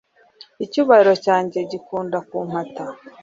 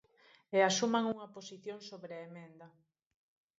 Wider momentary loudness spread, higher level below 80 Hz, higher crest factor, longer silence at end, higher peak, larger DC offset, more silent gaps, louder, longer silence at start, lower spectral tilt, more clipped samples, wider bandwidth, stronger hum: second, 18 LU vs 21 LU; first, -66 dBFS vs -84 dBFS; about the same, 18 dB vs 22 dB; second, 0.15 s vs 0.9 s; first, -2 dBFS vs -16 dBFS; neither; neither; first, -19 LUFS vs -33 LUFS; about the same, 0.6 s vs 0.5 s; first, -6 dB/octave vs -3 dB/octave; neither; about the same, 7.6 kHz vs 7.6 kHz; neither